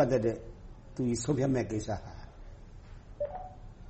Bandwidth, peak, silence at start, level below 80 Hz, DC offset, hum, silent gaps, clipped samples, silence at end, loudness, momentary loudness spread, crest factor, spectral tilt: 8.4 kHz; -16 dBFS; 0 s; -50 dBFS; under 0.1%; none; none; under 0.1%; 0 s; -33 LUFS; 23 LU; 18 dB; -6.5 dB/octave